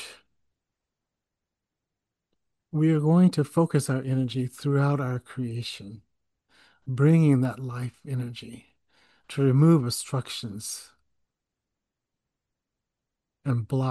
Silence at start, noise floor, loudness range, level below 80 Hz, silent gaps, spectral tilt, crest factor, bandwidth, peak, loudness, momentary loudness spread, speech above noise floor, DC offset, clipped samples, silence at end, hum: 0 s; -87 dBFS; 10 LU; -66 dBFS; none; -7 dB/octave; 18 dB; 12.5 kHz; -10 dBFS; -25 LUFS; 17 LU; 62 dB; under 0.1%; under 0.1%; 0 s; none